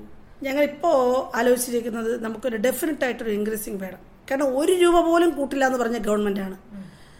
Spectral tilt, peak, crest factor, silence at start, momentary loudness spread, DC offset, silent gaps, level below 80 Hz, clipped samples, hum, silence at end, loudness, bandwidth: -4.5 dB/octave; -6 dBFS; 16 dB; 0 s; 14 LU; under 0.1%; none; -48 dBFS; under 0.1%; none; 0.15 s; -22 LUFS; 16.5 kHz